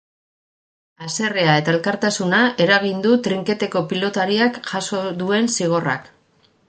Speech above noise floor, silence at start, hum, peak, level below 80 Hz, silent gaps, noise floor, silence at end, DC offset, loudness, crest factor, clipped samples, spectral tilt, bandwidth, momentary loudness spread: 40 dB; 1 s; none; -2 dBFS; -64 dBFS; none; -59 dBFS; 0.65 s; under 0.1%; -19 LUFS; 18 dB; under 0.1%; -4.5 dB/octave; 9.4 kHz; 8 LU